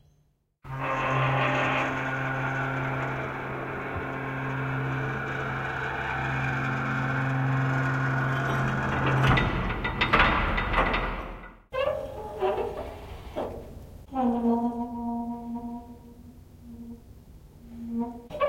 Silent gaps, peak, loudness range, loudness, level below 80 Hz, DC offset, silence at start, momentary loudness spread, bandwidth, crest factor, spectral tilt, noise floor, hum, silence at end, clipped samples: none; -6 dBFS; 8 LU; -28 LUFS; -42 dBFS; under 0.1%; 0.65 s; 16 LU; 8.6 kHz; 22 dB; -7 dB/octave; -68 dBFS; none; 0 s; under 0.1%